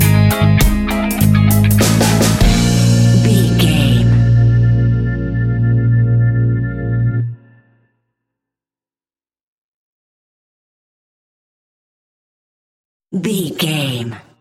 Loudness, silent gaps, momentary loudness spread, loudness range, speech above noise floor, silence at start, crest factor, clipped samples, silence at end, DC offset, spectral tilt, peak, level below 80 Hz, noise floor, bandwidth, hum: -13 LUFS; 9.41-13.00 s; 8 LU; 14 LU; over 71 dB; 0 s; 14 dB; under 0.1%; 0.2 s; under 0.1%; -6 dB/octave; 0 dBFS; -26 dBFS; under -90 dBFS; 16.5 kHz; none